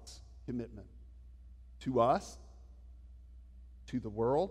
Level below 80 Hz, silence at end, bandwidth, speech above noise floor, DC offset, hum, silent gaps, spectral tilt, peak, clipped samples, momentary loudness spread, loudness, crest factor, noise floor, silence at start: -54 dBFS; 0 s; 13 kHz; 20 dB; under 0.1%; none; none; -7 dB/octave; -16 dBFS; under 0.1%; 26 LU; -35 LUFS; 22 dB; -54 dBFS; 0 s